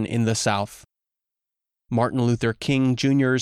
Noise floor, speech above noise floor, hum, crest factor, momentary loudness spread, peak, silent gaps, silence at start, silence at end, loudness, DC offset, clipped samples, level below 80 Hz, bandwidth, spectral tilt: -87 dBFS; 65 dB; none; 14 dB; 7 LU; -8 dBFS; none; 0 s; 0 s; -22 LUFS; under 0.1%; under 0.1%; -56 dBFS; 14 kHz; -5.5 dB/octave